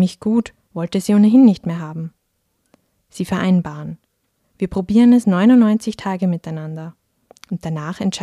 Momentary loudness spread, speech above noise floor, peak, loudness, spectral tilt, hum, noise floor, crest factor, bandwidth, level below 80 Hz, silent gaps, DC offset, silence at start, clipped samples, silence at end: 19 LU; 52 dB; -2 dBFS; -16 LUFS; -7 dB/octave; none; -68 dBFS; 16 dB; 12 kHz; -50 dBFS; none; under 0.1%; 0 s; under 0.1%; 0 s